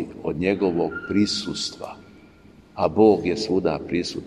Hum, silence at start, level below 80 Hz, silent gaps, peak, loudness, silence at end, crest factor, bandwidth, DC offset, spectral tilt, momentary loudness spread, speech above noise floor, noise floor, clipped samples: none; 0 s; -52 dBFS; none; -4 dBFS; -22 LUFS; 0 s; 20 dB; 10.5 kHz; under 0.1%; -5.5 dB/octave; 12 LU; 28 dB; -50 dBFS; under 0.1%